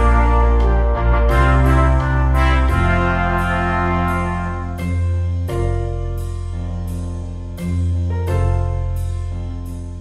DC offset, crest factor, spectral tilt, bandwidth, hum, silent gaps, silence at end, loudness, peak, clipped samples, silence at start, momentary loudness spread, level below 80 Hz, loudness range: under 0.1%; 14 dB; -7.5 dB/octave; 12 kHz; none; none; 0 s; -19 LUFS; -2 dBFS; under 0.1%; 0 s; 11 LU; -20 dBFS; 7 LU